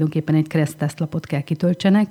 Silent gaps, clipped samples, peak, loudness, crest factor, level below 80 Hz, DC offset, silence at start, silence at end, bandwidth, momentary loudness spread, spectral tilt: none; under 0.1%; -6 dBFS; -21 LUFS; 14 dB; -60 dBFS; under 0.1%; 0 s; 0 s; 14.5 kHz; 8 LU; -7.5 dB/octave